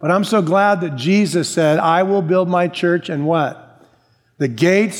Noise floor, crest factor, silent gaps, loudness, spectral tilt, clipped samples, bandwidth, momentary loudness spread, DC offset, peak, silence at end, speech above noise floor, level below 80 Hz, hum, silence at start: -57 dBFS; 16 dB; none; -16 LUFS; -6 dB/octave; under 0.1%; 16.5 kHz; 5 LU; under 0.1%; -2 dBFS; 0 s; 41 dB; -68 dBFS; none; 0 s